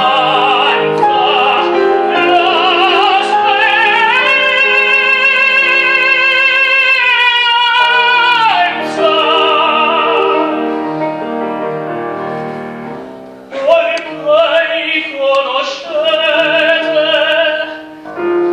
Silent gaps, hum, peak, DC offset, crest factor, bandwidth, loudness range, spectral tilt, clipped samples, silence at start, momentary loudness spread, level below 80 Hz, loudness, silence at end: none; none; 0 dBFS; under 0.1%; 12 dB; 12 kHz; 8 LU; -3.5 dB/octave; under 0.1%; 0 s; 12 LU; -56 dBFS; -10 LUFS; 0 s